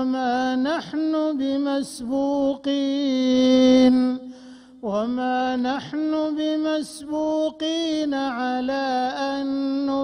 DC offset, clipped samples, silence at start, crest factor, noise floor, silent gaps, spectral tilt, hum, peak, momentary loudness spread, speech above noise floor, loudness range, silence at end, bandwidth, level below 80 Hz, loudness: under 0.1%; under 0.1%; 0 s; 16 dB; -44 dBFS; none; -4.5 dB/octave; none; -6 dBFS; 9 LU; 23 dB; 4 LU; 0 s; 11 kHz; -60 dBFS; -22 LUFS